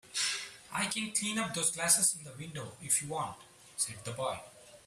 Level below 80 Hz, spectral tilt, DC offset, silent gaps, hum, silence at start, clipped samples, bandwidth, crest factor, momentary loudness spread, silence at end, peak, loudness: -72 dBFS; -1.5 dB/octave; under 0.1%; none; none; 0.05 s; under 0.1%; 15.5 kHz; 24 dB; 17 LU; 0.05 s; -12 dBFS; -32 LUFS